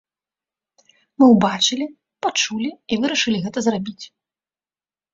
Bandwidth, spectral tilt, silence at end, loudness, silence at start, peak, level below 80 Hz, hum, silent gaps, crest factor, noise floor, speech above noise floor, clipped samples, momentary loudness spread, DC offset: 7.8 kHz; -3.5 dB/octave; 1.05 s; -19 LUFS; 1.2 s; -2 dBFS; -62 dBFS; none; none; 20 dB; under -90 dBFS; over 71 dB; under 0.1%; 17 LU; under 0.1%